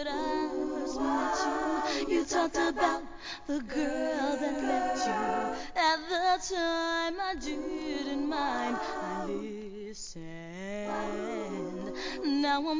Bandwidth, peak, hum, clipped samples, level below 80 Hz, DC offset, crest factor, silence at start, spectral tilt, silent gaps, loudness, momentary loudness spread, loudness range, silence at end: 7.6 kHz; -14 dBFS; none; under 0.1%; -56 dBFS; 0.2%; 18 dB; 0 s; -3.5 dB/octave; none; -32 LUFS; 11 LU; 6 LU; 0 s